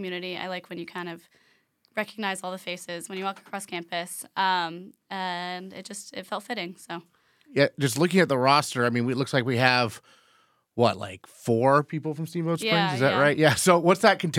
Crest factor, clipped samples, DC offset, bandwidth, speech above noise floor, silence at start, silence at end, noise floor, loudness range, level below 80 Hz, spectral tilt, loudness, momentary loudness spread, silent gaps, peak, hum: 24 dB; under 0.1%; under 0.1%; 18 kHz; 39 dB; 0 s; 0 s; -64 dBFS; 10 LU; -74 dBFS; -4.5 dB/octave; -25 LUFS; 17 LU; none; -2 dBFS; none